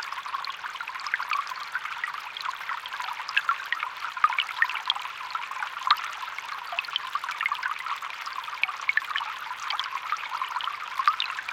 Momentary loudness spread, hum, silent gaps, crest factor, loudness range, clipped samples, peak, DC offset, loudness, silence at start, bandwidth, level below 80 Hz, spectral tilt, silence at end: 8 LU; none; none; 26 dB; 2 LU; under 0.1%; -6 dBFS; under 0.1%; -29 LUFS; 0 s; 17 kHz; -76 dBFS; 2 dB/octave; 0 s